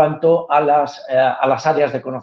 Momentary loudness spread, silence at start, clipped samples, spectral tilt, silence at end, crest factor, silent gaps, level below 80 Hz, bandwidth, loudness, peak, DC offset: 4 LU; 0 s; under 0.1%; -6.5 dB/octave; 0 s; 14 dB; none; -62 dBFS; 7.2 kHz; -16 LUFS; -2 dBFS; under 0.1%